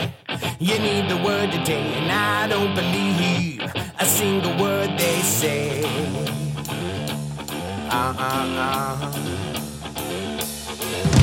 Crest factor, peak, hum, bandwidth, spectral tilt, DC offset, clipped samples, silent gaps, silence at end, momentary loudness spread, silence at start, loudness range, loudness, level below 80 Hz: 20 dB; -2 dBFS; none; 17 kHz; -4 dB/octave; under 0.1%; under 0.1%; none; 0 s; 9 LU; 0 s; 5 LU; -22 LUFS; -46 dBFS